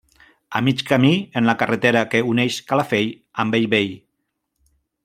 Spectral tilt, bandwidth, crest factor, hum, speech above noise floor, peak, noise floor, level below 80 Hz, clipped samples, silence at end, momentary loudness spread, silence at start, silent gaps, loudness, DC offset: -5.5 dB/octave; 15.5 kHz; 18 dB; none; 56 dB; -2 dBFS; -75 dBFS; -60 dBFS; under 0.1%; 1.1 s; 6 LU; 0.5 s; none; -19 LUFS; under 0.1%